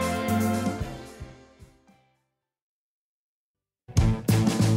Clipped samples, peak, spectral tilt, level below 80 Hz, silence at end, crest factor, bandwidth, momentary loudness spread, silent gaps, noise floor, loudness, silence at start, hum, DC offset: under 0.1%; -10 dBFS; -6 dB/octave; -38 dBFS; 0 s; 18 dB; 16 kHz; 20 LU; 2.62-3.55 s; under -90 dBFS; -26 LUFS; 0 s; none; under 0.1%